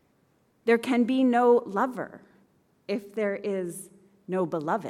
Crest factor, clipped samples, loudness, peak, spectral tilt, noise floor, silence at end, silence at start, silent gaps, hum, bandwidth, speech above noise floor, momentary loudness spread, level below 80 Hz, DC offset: 18 dB; under 0.1%; -26 LUFS; -10 dBFS; -6 dB/octave; -67 dBFS; 0 s; 0.65 s; none; none; 14.5 kHz; 41 dB; 16 LU; -76 dBFS; under 0.1%